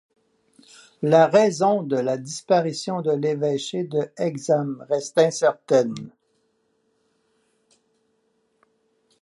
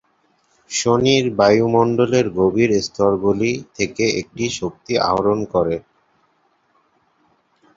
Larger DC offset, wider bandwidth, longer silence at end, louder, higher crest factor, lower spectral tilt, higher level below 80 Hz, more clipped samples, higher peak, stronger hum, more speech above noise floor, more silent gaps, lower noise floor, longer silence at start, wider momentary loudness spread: neither; first, 11.5 kHz vs 7.8 kHz; first, 3.1 s vs 1.95 s; second, -22 LUFS vs -18 LUFS; about the same, 20 dB vs 18 dB; about the same, -5.5 dB/octave vs -5 dB/octave; second, -76 dBFS vs -50 dBFS; neither; second, -4 dBFS vs 0 dBFS; neither; about the same, 48 dB vs 45 dB; neither; first, -69 dBFS vs -62 dBFS; first, 1 s vs 0.7 s; about the same, 10 LU vs 8 LU